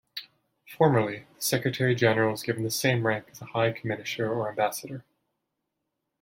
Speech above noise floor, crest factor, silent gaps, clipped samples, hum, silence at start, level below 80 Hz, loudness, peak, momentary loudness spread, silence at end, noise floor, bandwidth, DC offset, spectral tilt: 56 dB; 20 dB; none; under 0.1%; none; 0.15 s; -66 dBFS; -27 LUFS; -8 dBFS; 12 LU; 1.2 s; -82 dBFS; 16.5 kHz; under 0.1%; -5 dB/octave